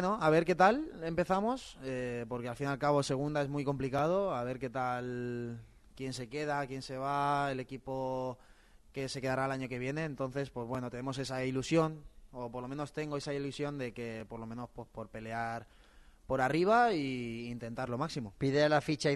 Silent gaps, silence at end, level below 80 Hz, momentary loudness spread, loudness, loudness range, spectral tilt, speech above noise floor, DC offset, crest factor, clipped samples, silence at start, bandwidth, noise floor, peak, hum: none; 0 s; -60 dBFS; 15 LU; -34 LUFS; 7 LU; -6 dB/octave; 25 dB; under 0.1%; 22 dB; under 0.1%; 0 s; 12 kHz; -59 dBFS; -12 dBFS; none